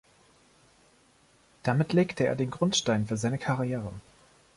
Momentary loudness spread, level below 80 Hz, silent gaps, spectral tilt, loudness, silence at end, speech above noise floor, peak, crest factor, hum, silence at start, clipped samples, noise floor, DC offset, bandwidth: 10 LU; -60 dBFS; none; -5 dB/octave; -28 LUFS; 0.55 s; 35 dB; -12 dBFS; 18 dB; none; 1.65 s; under 0.1%; -62 dBFS; under 0.1%; 11.5 kHz